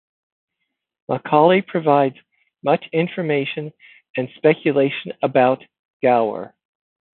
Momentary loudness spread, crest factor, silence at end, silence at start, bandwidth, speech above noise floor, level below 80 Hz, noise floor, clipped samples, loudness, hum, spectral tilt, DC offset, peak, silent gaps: 12 LU; 18 dB; 0.7 s; 1.1 s; 4.3 kHz; 59 dB; -70 dBFS; -78 dBFS; under 0.1%; -19 LUFS; none; -11 dB/octave; under 0.1%; -2 dBFS; 4.10-4.14 s, 5.79-6.00 s